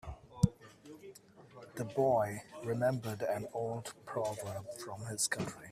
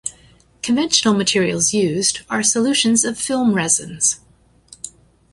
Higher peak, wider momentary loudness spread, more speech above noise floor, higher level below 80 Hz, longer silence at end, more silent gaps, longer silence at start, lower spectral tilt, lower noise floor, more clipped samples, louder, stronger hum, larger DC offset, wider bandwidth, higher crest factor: second, -12 dBFS vs -2 dBFS; first, 21 LU vs 15 LU; second, 20 dB vs 33 dB; second, -60 dBFS vs -54 dBFS; second, 0 s vs 0.45 s; neither; about the same, 0.05 s vs 0.05 s; first, -5 dB/octave vs -2.5 dB/octave; first, -57 dBFS vs -51 dBFS; neither; second, -36 LUFS vs -16 LUFS; neither; neither; first, 15.5 kHz vs 11.5 kHz; first, 24 dB vs 18 dB